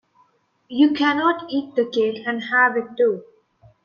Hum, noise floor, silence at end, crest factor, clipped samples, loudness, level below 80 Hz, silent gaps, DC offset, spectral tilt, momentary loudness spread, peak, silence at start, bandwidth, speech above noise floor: none; -62 dBFS; 0.6 s; 16 dB; under 0.1%; -20 LUFS; -70 dBFS; none; under 0.1%; -5.5 dB/octave; 8 LU; -6 dBFS; 0.7 s; 6.8 kHz; 42 dB